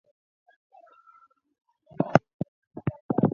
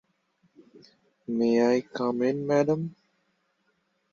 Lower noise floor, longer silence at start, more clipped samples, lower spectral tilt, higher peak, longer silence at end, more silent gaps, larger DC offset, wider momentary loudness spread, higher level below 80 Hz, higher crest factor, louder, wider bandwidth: second, -60 dBFS vs -73 dBFS; first, 2 s vs 0.75 s; neither; first, -8.5 dB/octave vs -7 dB/octave; first, 0 dBFS vs -10 dBFS; second, 0 s vs 1.25 s; first, 2.34-2.39 s, 2.48-2.71 s, 3.01-3.09 s vs none; neither; first, 14 LU vs 11 LU; first, -60 dBFS vs -74 dBFS; first, 30 dB vs 18 dB; about the same, -28 LUFS vs -26 LUFS; about the same, 7 kHz vs 7.2 kHz